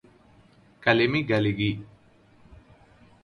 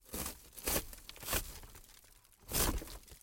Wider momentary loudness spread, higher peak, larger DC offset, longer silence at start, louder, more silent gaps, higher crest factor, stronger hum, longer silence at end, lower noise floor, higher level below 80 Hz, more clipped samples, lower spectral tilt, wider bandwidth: second, 7 LU vs 22 LU; first, -6 dBFS vs -18 dBFS; neither; first, 0.8 s vs 0.05 s; first, -24 LUFS vs -37 LUFS; neither; about the same, 24 dB vs 22 dB; neither; first, 0.7 s vs 0.05 s; second, -57 dBFS vs -62 dBFS; second, -56 dBFS vs -48 dBFS; neither; first, -7.5 dB/octave vs -2.5 dB/octave; second, 10.5 kHz vs 17 kHz